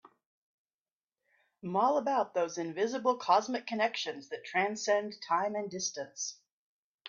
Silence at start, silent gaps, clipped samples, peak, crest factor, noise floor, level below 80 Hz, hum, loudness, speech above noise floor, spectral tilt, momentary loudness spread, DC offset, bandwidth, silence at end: 1.65 s; 6.51-6.99 s; under 0.1%; -12 dBFS; 22 dB; under -90 dBFS; -84 dBFS; none; -32 LUFS; over 58 dB; -3 dB/octave; 10 LU; under 0.1%; 7.6 kHz; 0 s